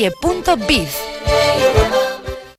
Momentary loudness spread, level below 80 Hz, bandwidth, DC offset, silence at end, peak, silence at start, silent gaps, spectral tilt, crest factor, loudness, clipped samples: 9 LU; -28 dBFS; 16 kHz; under 0.1%; 0.05 s; 0 dBFS; 0 s; none; -4.5 dB/octave; 16 dB; -16 LUFS; under 0.1%